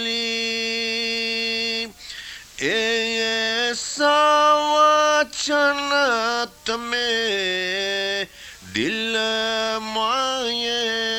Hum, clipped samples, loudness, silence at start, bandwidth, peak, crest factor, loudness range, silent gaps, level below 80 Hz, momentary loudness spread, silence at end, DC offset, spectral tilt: none; under 0.1%; -20 LUFS; 0 s; 17 kHz; -6 dBFS; 16 dB; 5 LU; none; -56 dBFS; 11 LU; 0 s; under 0.1%; -1.5 dB/octave